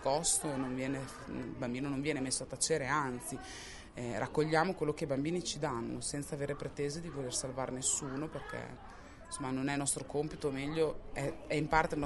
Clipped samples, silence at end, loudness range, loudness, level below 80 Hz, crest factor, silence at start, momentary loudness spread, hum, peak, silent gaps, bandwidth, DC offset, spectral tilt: under 0.1%; 0 s; 3 LU; -36 LUFS; -56 dBFS; 24 dB; 0 s; 12 LU; none; -12 dBFS; none; 11.5 kHz; under 0.1%; -4 dB/octave